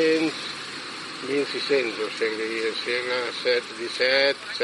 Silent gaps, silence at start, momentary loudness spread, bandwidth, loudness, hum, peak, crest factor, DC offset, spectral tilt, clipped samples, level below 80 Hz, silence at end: none; 0 s; 11 LU; 11.5 kHz; -25 LUFS; none; -8 dBFS; 18 dB; under 0.1%; -2.5 dB/octave; under 0.1%; -88 dBFS; 0 s